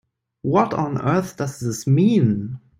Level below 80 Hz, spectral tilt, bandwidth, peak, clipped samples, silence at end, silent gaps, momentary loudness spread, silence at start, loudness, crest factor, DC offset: -56 dBFS; -7.5 dB/octave; 16 kHz; -4 dBFS; under 0.1%; 0.2 s; none; 10 LU; 0.45 s; -20 LUFS; 16 dB; under 0.1%